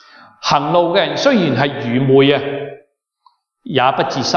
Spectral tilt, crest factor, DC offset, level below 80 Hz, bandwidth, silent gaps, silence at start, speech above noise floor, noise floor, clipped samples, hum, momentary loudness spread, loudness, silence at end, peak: -5.5 dB/octave; 14 dB; under 0.1%; -56 dBFS; 7.2 kHz; none; 0.4 s; 43 dB; -57 dBFS; under 0.1%; none; 11 LU; -15 LUFS; 0 s; 0 dBFS